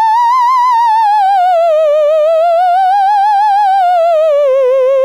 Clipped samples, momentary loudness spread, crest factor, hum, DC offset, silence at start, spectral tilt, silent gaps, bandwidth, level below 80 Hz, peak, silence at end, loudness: under 0.1%; 1 LU; 4 dB; none; 0.3%; 0 s; 1.5 dB/octave; none; 15.5 kHz; -68 dBFS; -6 dBFS; 0 s; -9 LUFS